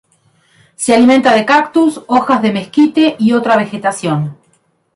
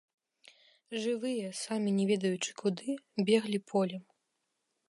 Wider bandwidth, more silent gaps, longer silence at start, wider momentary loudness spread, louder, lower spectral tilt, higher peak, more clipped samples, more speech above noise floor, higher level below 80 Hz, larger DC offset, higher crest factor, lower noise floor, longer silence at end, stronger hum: about the same, 11.5 kHz vs 11.5 kHz; neither; about the same, 0.8 s vs 0.9 s; about the same, 9 LU vs 8 LU; first, -12 LUFS vs -33 LUFS; about the same, -5 dB/octave vs -5 dB/octave; first, 0 dBFS vs -14 dBFS; neither; second, 46 dB vs 50 dB; first, -54 dBFS vs -86 dBFS; neither; second, 12 dB vs 20 dB; second, -57 dBFS vs -82 dBFS; second, 0.65 s vs 0.9 s; neither